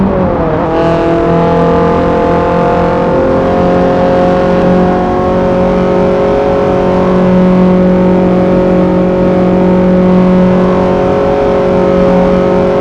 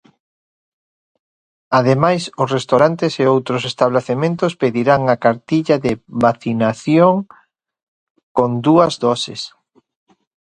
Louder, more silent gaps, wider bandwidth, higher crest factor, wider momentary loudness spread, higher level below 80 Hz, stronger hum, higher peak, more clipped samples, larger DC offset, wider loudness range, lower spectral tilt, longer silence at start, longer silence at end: first, -9 LUFS vs -16 LUFS; second, none vs 7.83-8.15 s, 8.23-8.35 s; second, 7.2 kHz vs 10.5 kHz; second, 8 dB vs 16 dB; second, 3 LU vs 8 LU; first, -26 dBFS vs -54 dBFS; neither; about the same, 0 dBFS vs 0 dBFS; first, 0.7% vs under 0.1%; neither; about the same, 1 LU vs 2 LU; first, -9 dB/octave vs -6.5 dB/octave; second, 0 s vs 1.7 s; second, 0 s vs 1.05 s